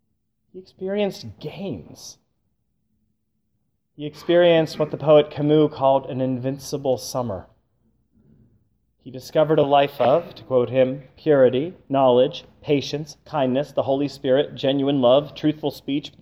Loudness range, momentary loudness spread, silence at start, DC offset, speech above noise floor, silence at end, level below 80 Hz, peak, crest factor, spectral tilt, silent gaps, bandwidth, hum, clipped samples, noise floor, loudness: 12 LU; 16 LU; 0.55 s; under 0.1%; 53 dB; 0.1 s; -60 dBFS; -4 dBFS; 18 dB; -6.5 dB/octave; none; 15.5 kHz; none; under 0.1%; -73 dBFS; -21 LUFS